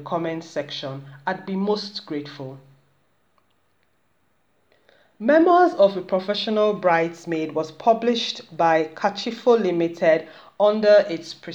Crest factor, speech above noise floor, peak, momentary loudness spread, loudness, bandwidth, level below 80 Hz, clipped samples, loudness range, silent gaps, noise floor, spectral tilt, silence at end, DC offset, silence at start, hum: 18 dB; 47 dB; -4 dBFS; 14 LU; -21 LUFS; 8 kHz; -74 dBFS; under 0.1%; 11 LU; none; -68 dBFS; -5.5 dB/octave; 0 s; under 0.1%; 0 s; none